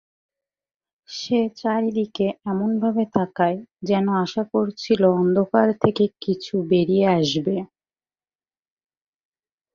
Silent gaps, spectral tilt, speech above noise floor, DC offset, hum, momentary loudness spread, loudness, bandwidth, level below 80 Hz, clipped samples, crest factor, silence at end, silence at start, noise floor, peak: none; -7 dB/octave; over 69 dB; under 0.1%; none; 7 LU; -21 LUFS; 7.2 kHz; -62 dBFS; under 0.1%; 20 dB; 2.1 s; 1.1 s; under -90 dBFS; -2 dBFS